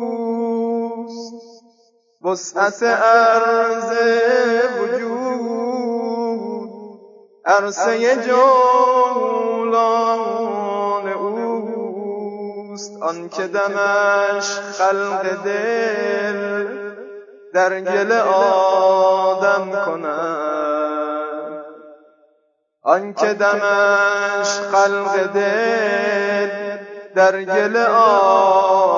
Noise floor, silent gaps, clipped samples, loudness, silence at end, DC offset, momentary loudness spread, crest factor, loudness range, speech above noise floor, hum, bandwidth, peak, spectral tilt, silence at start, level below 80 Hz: -65 dBFS; none; under 0.1%; -17 LUFS; 0 s; under 0.1%; 14 LU; 16 dB; 6 LU; 49 dB; none; 7.6 kHz; -2 dBFS; -3.5 dB/octave; 0 s; -86 dBFS